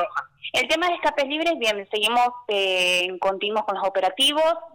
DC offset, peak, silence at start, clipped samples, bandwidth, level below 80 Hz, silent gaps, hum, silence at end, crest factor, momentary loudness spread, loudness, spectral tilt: under 0.1%; -14 dBFS; 0 s; under 0.1%; 19 kHz; -60 dBFS; none; none; 0.05 s; 10 dB; 6 LU; -22 LUFS; -1.5 dB/octave